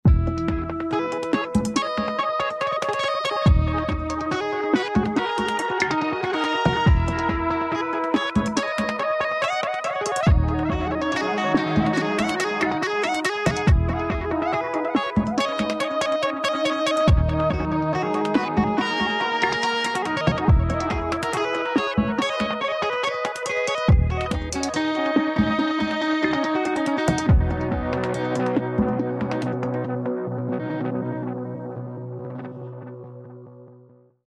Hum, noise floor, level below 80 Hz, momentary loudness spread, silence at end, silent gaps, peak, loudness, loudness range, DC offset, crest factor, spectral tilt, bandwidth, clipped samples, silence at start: none; -52 dBFS; -32 dBFS; 7 LU; 0.5 s; none; -8 dBFS; -23 LUFS; 3 LU; under 0.1%; 16 dB; -6 dB/octave; 12.5 kHz; under 0.1%; 0.05 s